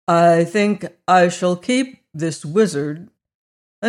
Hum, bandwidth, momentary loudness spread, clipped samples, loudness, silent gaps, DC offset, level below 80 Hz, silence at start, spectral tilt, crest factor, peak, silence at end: none; 12.5 kHz; 12 LU; under 0.1%; -18 LUFS; 3.35-3.82 s; under 0.1%; -68 dBFS; 0.1 s; -5.5 dB/octave; 14 dB; -4 dBFS; 0 s